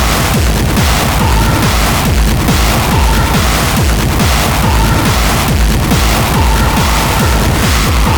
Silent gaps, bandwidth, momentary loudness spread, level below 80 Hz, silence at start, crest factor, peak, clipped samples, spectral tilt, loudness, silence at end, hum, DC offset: none; over 20 kHz; 1 LU; -14 dBFS; 0 s; 10 dB; 0 dBFS; under 0.1%; -4.5 dB/octave; -11 LUFS; 0 s; none; under 0.1%